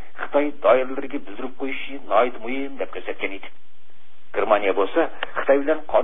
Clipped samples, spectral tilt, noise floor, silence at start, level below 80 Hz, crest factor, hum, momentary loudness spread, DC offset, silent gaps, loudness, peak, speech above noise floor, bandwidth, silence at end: under 0.1%; -9 dB/octave; -59 dBFS; 0.15 s; -62 dBFS; 20 dB; none; 12 LU; 6%; none; -23 LUFS; -2 dBFS; 37 dB; 3.9 kHz; 0 s